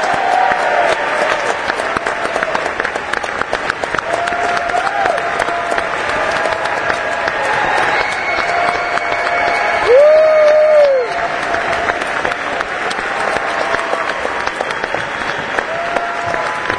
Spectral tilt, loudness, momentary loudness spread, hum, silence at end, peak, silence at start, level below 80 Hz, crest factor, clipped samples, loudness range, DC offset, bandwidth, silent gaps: -3 dB/octave; -15 LUFS; 9 LU; none; 0 s; 0 dBFS; 0 s; -44 dBFS; 16 dB; under 0.1%; 6 LU; under 0.1%; 10.5 kHz; none